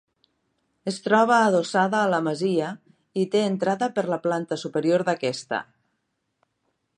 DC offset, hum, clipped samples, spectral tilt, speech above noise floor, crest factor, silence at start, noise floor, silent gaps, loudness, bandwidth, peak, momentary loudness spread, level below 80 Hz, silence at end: under 0.1%; none; under 0.1%; -5.5 dB/octave; 53 dB; 18 dB; 0.85 s; -76 dBFS; none; -23 LUFS; 10.5 kHz; -6 dBFS; 12 LU; -76 dBFS; 1.35 s